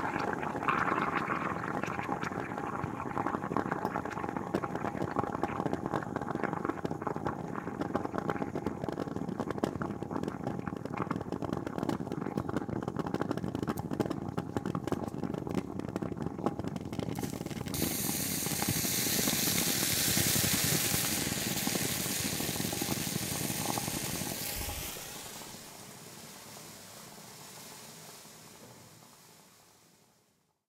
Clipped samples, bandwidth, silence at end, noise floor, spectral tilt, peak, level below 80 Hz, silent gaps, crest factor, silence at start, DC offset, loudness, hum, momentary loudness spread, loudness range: under 0.1%; 17.5 kHz; 1.15 s; -72 dBFS; -3.5 dB/octave; -12 dBFS; -58 dBFS; none; 22 dB; 0 s; under 0.1%; -33 LUFS; none; 18 LU; 16 LU